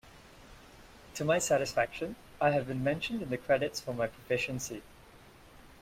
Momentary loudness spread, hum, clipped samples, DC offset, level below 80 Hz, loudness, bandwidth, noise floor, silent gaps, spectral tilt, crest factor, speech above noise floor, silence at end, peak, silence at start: 11 LU; none; under 0.1%; under 0.1%; -60 dBFS; -32 LUFS; 16.5 kHz; -56 dBFS; none; -4.5 dB/octave; 20 dB; 24 dB; 0 s; -14 dBFS; 0.05 s